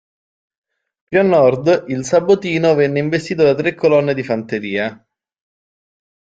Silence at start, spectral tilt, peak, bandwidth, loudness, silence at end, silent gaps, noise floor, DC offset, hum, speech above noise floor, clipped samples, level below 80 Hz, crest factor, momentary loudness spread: 1.1 s; -6 dB/octave; -2 dBFS; 9.2 kHz; -16 LUFS; 1.4 s; none; under -90 dBFS; under 0.1%; none; over 75 dB; under 0.1%; -56 dBFS; 16 dB; 8 LU